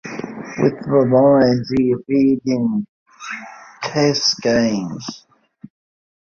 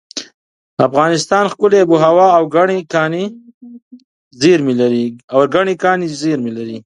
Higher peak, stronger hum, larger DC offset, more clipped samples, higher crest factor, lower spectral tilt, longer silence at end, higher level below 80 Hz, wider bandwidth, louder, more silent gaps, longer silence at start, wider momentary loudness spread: about the same, -2 dBFS vs 0 dBFS; neither; neither; neither; about the same, 16 dB vs 14 dB; about the same, -5.5 dB/octave vs -5.5 dB/octave; first, 1.05 s vs 0.05 s; first, -54 dBFS vs -60 dBFS; second, 7.4 kHz vs 11 kHz; second, -17 LUFS vs -13 LUFS; second, 2.89-3.06 s vs 0.34-0.77 s, 3.54-3.61 s, 3.82-3.91 s, 4.04-4.31 s, 5.24-5.28 s; about the same, 0.05 s vs 0.15 s; first, 18 LU vs 11 LU